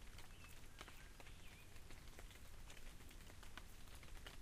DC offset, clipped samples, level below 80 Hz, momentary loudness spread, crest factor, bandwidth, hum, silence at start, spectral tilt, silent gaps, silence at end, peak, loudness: under 0.1%; under 0.1%; -60 dBFS; 2 LU; 22 dB; 15.5 kHz; none; 0 s; -3 dB/octave; none; 0 s; -34 dBFS; -60 LUFS